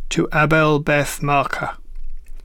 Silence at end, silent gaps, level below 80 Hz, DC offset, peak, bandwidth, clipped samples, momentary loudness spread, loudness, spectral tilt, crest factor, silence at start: 0 s; none; -32 dBFS; under 0.1%; -6 dBFS; 18 kHz; under 0.1%; 12 LU; -18 LUFS; -5.5 dB/octave; 14 dB; 0 s